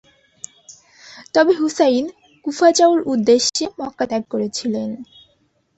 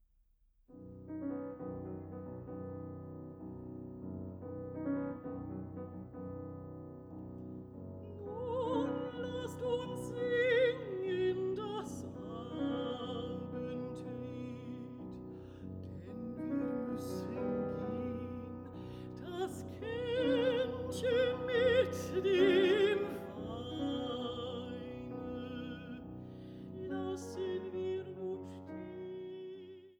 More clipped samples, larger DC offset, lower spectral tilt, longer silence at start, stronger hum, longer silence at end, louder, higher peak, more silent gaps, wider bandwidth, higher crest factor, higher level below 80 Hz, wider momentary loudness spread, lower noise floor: neither; neither; second, -3 dB/octave vs -6 dB/octave; first, 1.05 s vs 0.7 s; neither; first, 0.75 s vs 0.05 s; first, -18 LUFS vs -38 LUFS; first, -2 dBFS vs -18 dBFS; neither; second, 8.4 kHz vs 16 kHz; about the same, 18 dB vs 20 dB; about the same, -62 dBFS vs -64 dBFS; about the same, 18 LU vs 16 LU; second, -62 dBFS vs -71 dBFS